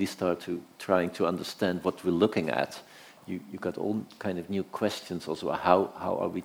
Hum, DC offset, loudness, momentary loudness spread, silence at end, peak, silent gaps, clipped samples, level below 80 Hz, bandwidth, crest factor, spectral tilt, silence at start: none; under 0.1%; -30 LUFS; 12 LU; 0 s; -4 dBFS; none; under 0.1%; -66 dBFS; over 20 kHz; 26 dB; -6 dB/octave; 0 s